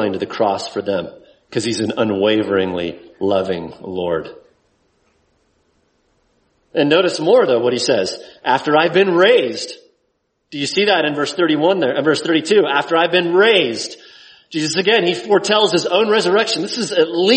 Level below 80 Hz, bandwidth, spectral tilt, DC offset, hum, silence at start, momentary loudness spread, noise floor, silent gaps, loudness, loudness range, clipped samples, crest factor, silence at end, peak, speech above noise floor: -60 dBFS; 8.8 kHz; -4 dB/octave; under 0.1%; none; 0 s; 12 LU; -68 dBFS; none; -16 LUFS; 8 LU; under 0.1%; 16 dB; 0 s; 0 dBFS; 52 dB